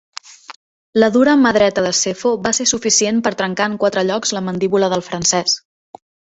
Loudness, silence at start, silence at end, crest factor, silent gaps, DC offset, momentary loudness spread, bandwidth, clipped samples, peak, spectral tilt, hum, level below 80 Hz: -16 LUFS; 0.3 s; 0.75 s; 16 dB; 0.56-0.93 s; under 0.1%; 8 LU; 8.2 kHz; under 0.1%; 0 dBFS; -3 dB/octave; none; -54 dBFS